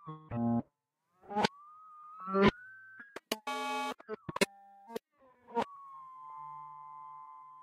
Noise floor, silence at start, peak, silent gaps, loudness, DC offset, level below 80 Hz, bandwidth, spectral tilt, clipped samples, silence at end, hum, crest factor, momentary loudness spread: -80 dBFS; 0.05 s; -12 dBFS; none; -35 LUFS; under 0.1%; -64 dBFS; 15.5 kHz; -5 dB/octave; under 0.1%; 0 s; none; 26 dB; 21 LU